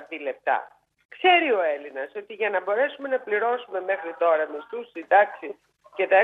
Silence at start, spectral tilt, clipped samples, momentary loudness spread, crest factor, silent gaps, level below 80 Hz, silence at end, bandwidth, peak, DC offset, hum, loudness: 0 s; -5 dB/octave; under 0.1%; 16 LU; 20 dB; 1.05-1.09 s; -80 dBFS; 0 s; 4.2 kHz; -6 dBFS; under 0.1%; none; -24 LUFS